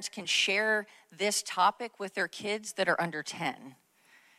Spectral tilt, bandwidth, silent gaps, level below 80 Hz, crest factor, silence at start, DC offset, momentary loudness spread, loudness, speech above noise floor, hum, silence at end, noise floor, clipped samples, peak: -2 dB/octave; 15.5 kHz; none; -84 dBFS; 20 dB; 0 s; under 0.1%; 11 LU; -30 LUFS; 31 dB; none; 0.65 s; -63 dBFS; under 0.1%; -12 dBFS